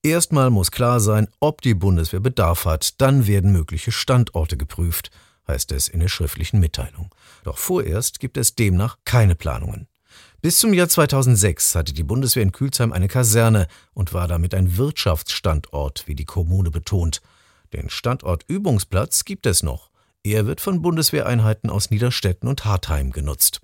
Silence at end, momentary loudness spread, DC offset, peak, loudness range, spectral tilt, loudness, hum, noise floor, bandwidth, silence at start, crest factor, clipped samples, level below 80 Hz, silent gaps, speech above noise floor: 0.05 s; 12 LU; under 0.1%; -2 dBFS; 6 LU; -4.5 dB/octave; -19 LUFS; none; -51 dBFS; 17 kHz; 0.05 s; 18 dB; under 0.1%; -34 dBFS; none; 32 dB